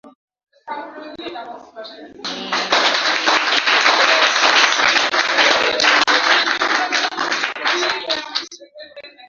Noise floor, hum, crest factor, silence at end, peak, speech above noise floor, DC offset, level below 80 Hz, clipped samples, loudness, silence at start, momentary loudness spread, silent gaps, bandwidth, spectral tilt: -39 dBFS; none; 18 dB; 0.05 s; 0 dBFS; 14 dB; under 0.1%; -62 dBFS; under 0.1%; -15 LUFS; 0.05 s; 19 LU; 0.15-0.28 s, 0.43-0.47 s; 7.8 kHz; 0 dB/octave